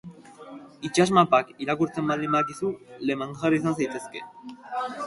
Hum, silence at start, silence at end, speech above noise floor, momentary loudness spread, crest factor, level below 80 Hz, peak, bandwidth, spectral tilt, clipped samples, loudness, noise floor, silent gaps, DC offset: none; 0.05 s; 0 s; 19 dB; 21 LU; 22 dB; -64 dBFS; -4 dBFS; 11.5 kHz; -5.5 dB/octave; under 0.1%; -25 LUFS; -44 dBFS; none; under 0.1%